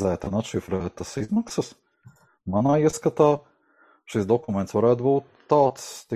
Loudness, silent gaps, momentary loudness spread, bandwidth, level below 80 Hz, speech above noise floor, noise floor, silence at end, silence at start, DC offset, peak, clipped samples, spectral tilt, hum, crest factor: -24 LUFS; none; 10 LU; 14.5 kHz; -50 dBFS; 37 dB; -60 dBFS; 0 s; 0 s; under 0.1%; -4 dBFS; under 0.1%; -6.5 dB/octave; none; 20 dB